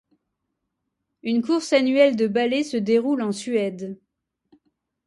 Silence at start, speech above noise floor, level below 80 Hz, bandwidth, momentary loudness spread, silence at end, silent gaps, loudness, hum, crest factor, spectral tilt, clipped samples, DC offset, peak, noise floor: 1.25 s; 58 dB; -70 dBFS; 11.5 kHz; 16 LU; 1.1 s; none; -21 LUFS; none; 18 dB; -5 dB/octave; under 0.1%; under 0.1%; -6 dBFS; -79 dBFS